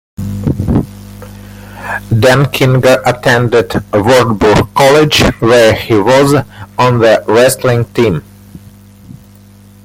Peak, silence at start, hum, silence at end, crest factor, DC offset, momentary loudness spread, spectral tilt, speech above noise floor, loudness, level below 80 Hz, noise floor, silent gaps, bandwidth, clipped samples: 0 dBFS; 0.2 s; 50 Hz at -30 dBFS; 0.7 s; 10 dB; under 0.1%; 15 LU; -5.5 dB/octave; 29 dB; -9 LUFS; -32 dBFS; -38 dBFS; none; 16.5 kHz; under 0.1%